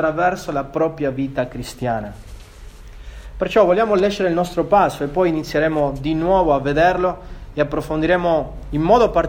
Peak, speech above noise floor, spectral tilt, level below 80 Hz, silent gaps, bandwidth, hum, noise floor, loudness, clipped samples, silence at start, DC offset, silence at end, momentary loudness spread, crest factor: 0 dBFS; 20 dB; -6.5 dB/octave; -36 dBFS; none; 16.5 kHz; none; -38 dBFS; -19 LUFS; under 0.1%; 0 s; under 0.1%; 0 s; 11 LU; 18 dB